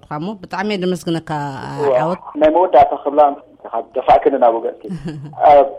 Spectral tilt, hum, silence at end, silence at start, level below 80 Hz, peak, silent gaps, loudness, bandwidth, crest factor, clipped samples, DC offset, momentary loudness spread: -6.5 dB/octave; none; 0 s; 0.1 s; -46 dBFS; 0 dBFS; none; -16 LUFS; 11.5 kHz; 14 dB; under 0.1%; under 0.1%; 15 LU